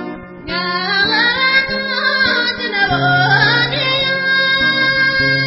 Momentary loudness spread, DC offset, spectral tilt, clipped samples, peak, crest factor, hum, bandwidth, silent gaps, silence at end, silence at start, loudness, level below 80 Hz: 6 LU; under 0.1%; -7.5 dB/octave; under 0.1%; 0 dBFS; 14 dB; none; 5.8 kHz; none; 0 s; 0 s; -13 LUFS; -44 dBFS